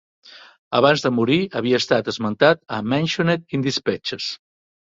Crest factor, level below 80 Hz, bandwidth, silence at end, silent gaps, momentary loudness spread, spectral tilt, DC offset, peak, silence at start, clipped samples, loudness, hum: 20 dB; -60 dBFS; 7.8 kHz; 0.55 s; 0.58-0.71 s; 8 LU; -5.5 dB/octave; under 0.1%; -2 dBFS; 0.35 s; under 0.1%; -20 LUFS; none